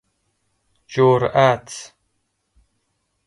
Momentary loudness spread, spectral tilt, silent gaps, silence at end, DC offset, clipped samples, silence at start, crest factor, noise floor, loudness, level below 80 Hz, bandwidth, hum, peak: 19 LU; -6 dB/octave; none; 1.4 s; under 0.1%; under 0.1%; 0.9 s; 20 dB; -71 dBFS; -17 LUFS; -56 dBFS; 11.5 kHz; none; -2 dBFS